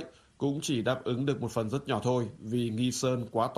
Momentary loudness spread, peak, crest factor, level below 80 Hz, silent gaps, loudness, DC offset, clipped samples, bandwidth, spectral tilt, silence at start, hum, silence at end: 4 LU; -14 dBFS; 18 dB; -64 dBFS; none; -31 LUFS; under 0.1%; under 0.1%; 13.5 kHz; -5.5 dB/octave; 0 s; none; 0 s